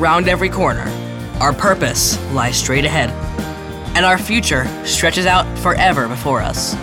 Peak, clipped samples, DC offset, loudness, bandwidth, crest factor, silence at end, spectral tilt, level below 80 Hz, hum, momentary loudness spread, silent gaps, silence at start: -2 dBFS; under 0.1%; under 0.1%; -15 LUFS; 18 kHz; 14 dB; 0 s; -3.5 dB/octave; -30 dBFS; none; 11 LU; none; 0 s